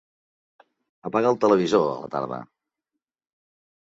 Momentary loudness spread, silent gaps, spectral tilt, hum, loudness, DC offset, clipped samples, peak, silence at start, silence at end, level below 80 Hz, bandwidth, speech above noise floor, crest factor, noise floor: 15 LU; none; -6.5 dB/octave; none; -23 LUFS; under 0.1%; under 0.1%; -6 dBFS; 1.05 s; 1.45 s; -68 dBFS; 7.8 kHz; 63 dB; 20 dB; -85 dBFS